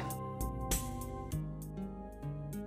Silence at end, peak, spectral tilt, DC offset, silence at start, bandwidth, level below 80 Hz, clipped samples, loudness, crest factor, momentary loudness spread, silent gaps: 0 s; -18 dBFS; -5 dB/octave; under 0.1%; 0 s; 16 kHz; -46 dBFS; under 0.1%; -40 LUFS; 20 dB; 8 LU; none